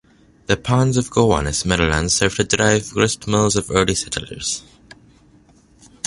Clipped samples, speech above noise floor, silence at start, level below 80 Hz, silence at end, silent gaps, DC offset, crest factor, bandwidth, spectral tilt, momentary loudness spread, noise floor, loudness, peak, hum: under 0.1%; 33 dB; 0.5 s; -36 dBFS; 1.45 s; none; under 0.1%; 20 dB; 11.5 kHz; -4 dB/octave; 8 LU; -51 dBFS; -18 LUFS; 0 dBFS; none